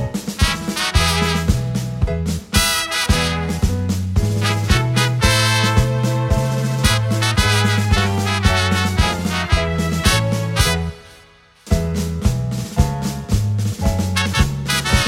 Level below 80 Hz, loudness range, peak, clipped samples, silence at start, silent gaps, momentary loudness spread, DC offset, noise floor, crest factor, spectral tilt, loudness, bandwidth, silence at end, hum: -26 dBFS; 4 LU; 0 dBFS; under 0.1%; 0 s; none; 6 LU; under 0.1%; -48 dBFS; 16 dB; -4.5 dB/octave; -18 LUFS; 16.5 kHz; 0 s; none